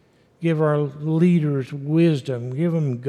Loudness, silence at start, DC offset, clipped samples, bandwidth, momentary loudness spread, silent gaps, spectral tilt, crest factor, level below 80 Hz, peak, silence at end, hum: -21 LUFS; 0.4 s; under 0.1%; under 0.1%; 9.6 kHz; 8 LU; none; -9 dB/octave; 14 dB; -72 dBFS; -6 dBFS; 0 s; none